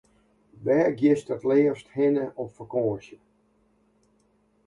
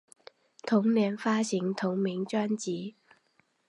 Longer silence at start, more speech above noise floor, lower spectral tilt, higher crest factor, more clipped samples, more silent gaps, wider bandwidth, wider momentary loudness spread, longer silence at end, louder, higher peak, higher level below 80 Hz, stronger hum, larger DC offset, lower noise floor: about the same, 0.6 s vs 0.65 s; about the same, 42 dB vs 42 dB; first, -8 dB/octave vs -5.5 dB/octave; about the same, 16 dB vs 18 dB; neither; neither; about the same, 11 kHz vs 11 kHz; about the same, 12 LU vs 11 LU; first, 1.5 s vs 0.8 s; first, -25 LUFS vs -29 LUFS; about the same, -10 dBFS vs -12 dBFS; first, -66 dBFS vs -82 dBFS; neither; neither; second, -66 dBFS vs -70 dBFS